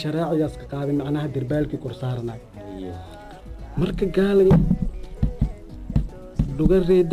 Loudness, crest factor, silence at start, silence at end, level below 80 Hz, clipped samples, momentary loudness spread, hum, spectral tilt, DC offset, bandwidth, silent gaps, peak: -23 LUFS; 16 dB; 0 s; 0 s; -32 dBFS; under 0.1%; 21 LU; none; -9 dB/octave; under 0.1%; 14.5 kHz; none; -6 dBFS